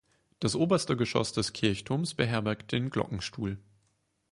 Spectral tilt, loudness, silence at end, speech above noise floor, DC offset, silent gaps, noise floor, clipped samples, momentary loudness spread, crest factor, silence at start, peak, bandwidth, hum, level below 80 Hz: -5 dB/octave; -30 LUFS; 0.7 s; 44 dB; under 0.1%; none; -74 dBFS; under 0.1%; 8 LU; 20 dB; 0.4 s; -10 dBFS; 11.5 kHz; none; -56 dBFS